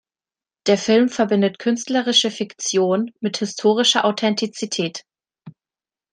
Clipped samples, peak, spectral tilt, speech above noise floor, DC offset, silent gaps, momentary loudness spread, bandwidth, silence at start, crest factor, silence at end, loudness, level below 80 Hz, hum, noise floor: under 0.1%; -2 dBFS; -3.5 dB/octave; over 71 dB; under 0.1%; none; 9 LU; 10.5 kHz; 0.65 s; 18 dB; 0.65 s; -19 LUFS; -68 dBFS; none; under -90 dBFS